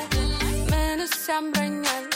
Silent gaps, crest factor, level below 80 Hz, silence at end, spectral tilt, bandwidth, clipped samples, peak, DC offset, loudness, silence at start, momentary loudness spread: none; 16 dB; -30 dBFS; 0 s; -4 dB/octave; 17 kHz; under 0.1%; -10 dBFS; under 0.1%; -25 LUFS; 0 s; 2 LU